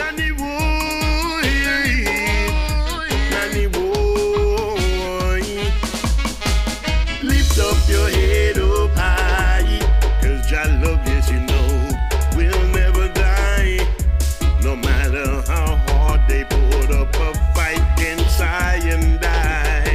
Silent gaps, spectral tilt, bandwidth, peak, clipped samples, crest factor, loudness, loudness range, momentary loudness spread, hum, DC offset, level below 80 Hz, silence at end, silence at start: none; -5 dB/octave; 15.5 kHz; -4 dBFS; under 0.1%; 12 dB; -18 LUFS; 2 LU; 4 LU; none; under 0.1%; -18 dBFS; 0 s; 0 s